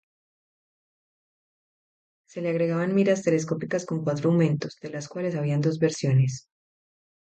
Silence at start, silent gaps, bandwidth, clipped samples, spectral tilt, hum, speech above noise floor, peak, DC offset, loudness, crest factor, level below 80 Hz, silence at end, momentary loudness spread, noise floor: 2.35 s; none; 8.8 kHz; under 0.1%; -7 dB/octave; none; over 66 dB; -10 dBFS; under 0.1%; -25 LUFS; 18 dB; -68 dBFS; 0.9 s; 11 LU; under -90 dBFS